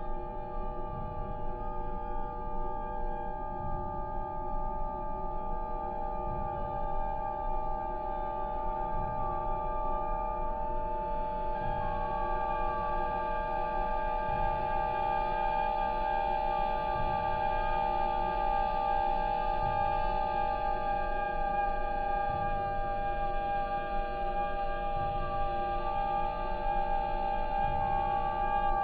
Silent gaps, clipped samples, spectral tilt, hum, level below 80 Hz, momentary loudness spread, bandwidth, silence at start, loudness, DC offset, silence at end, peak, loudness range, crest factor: none; under 0.1%; -8.5 dB/octave; none; -38 dBFS; 7 LU; 4.8 kHz; 0 s; -33 LUFS; under 0.1%; 0 s; -18 dBFS; 7 LU; 14 dB